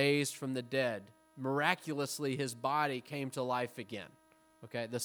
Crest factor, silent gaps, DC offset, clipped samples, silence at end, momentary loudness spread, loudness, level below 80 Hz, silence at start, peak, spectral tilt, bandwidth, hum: 24 dB; none; under 0.1%; under 0.1%; 0 s; 12 LU; -36 LUFS; -84 dBFS; 0 s; -12 dBFS; -4.5 dB/octave; over 20 kHz; none